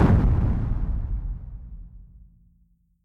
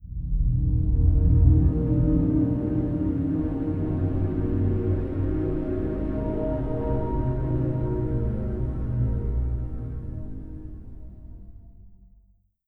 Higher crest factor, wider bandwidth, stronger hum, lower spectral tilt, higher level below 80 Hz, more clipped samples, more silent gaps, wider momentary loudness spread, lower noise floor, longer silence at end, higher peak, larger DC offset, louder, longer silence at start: about the same, 18 dB vs 18 dB; first, 5.2 kHz vs 3.1 kHz; neither; second, -10 dB/octave vs -12.5 dB/octave; about the same, -28 dBFS vs -28 dBFS; neither; neither; first, 24 LU vs 16 LU; about the same, -62 dBFS vs -60 dBFS; about the same, 0.7 s vs 0.75 s; about the same, -6 dBFS vs -6 dBFS; neither; about the same, -25 LUFS vs -25 LUFS; about the same, 0 s vs 0 s